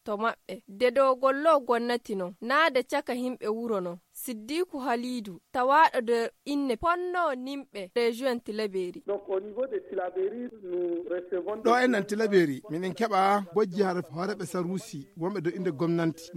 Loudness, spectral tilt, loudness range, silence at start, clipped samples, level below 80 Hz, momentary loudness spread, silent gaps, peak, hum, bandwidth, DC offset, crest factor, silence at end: -28 LUFS; -5.5 dB/octave; 5 LU; 0.05 s; under 0.1%; -64 dBFS; 11 LU; none; -10 dBFS; none; 16.5 kHz; under 0.1%; 18 dB; 0 s